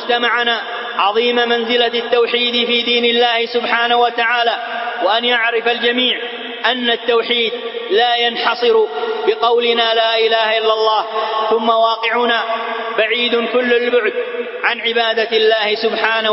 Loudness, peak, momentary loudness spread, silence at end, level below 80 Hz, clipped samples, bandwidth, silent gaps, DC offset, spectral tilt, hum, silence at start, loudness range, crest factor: -15 LUFS; 0 dBFS; 6 LU; 0 s; -68 dBFS; under 0.1%; 5.8 kHz; none; under 0.1%; -5 dB/octave; none; 0 s; 2 LU; 16 dB